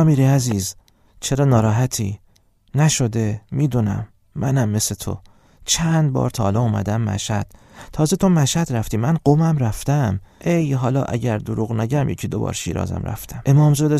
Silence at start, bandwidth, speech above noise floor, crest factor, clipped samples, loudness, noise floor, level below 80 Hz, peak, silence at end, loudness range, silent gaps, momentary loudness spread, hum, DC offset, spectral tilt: 0 s; 15.5 kHz; 37 dB; 18 dB; under 0.1%; -20 LUFS; -55 dBFS; -42 dBFS; -2 dBFS; 0 s; 2 LU; none; 11 LU; none; under 0.1%; -6 dB/octave